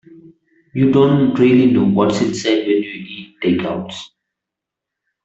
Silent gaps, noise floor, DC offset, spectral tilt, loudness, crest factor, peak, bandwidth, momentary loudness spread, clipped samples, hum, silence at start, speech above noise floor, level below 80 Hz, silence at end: none; -83 dBFS; under 0.1%; -6.5 dB/octave; -15 LUFS; 14 dB; -2 dBFS; 8 kHz; 17 LU; under 0.1%; none; 0.75 s; 68 dB; -54 dBFS; 1.2 s